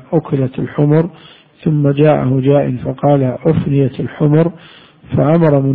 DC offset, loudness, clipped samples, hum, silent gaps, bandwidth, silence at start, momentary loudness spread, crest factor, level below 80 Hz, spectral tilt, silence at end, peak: under 0.1%; -14 LUFS; under 0.1%; none; none; 4.1 kHz; 0.1 s; 7 LU; 14 dB; -44 dBFS; -12.5 dB/octave; 0 s; 0 dBFS